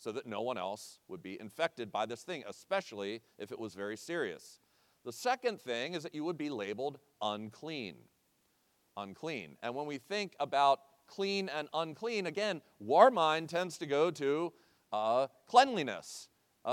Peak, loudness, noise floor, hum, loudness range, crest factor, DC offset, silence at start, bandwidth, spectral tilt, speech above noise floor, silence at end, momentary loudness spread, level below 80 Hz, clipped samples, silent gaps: -10 dBFS; -35 LUFS; -75 dBFS; none; 10 LU; 26 dB; under 0.1%; 0 s; 16.5 kHz; -4 dB/octave; 40 dB; 0 s; 18 LU; -88 dBFS; under 0.1%; none